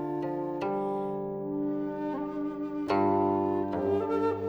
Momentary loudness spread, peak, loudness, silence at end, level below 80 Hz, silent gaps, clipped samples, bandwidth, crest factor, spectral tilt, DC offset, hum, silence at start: 8 LU; -16 dBFS; -30 LUFS; 0 s; -64 dBFS; none; under 0.1%; 6.6 kHz; 14 dB; -9 dB/octave; under 0.1%; 50 Hz at -65 dBFS; 0 s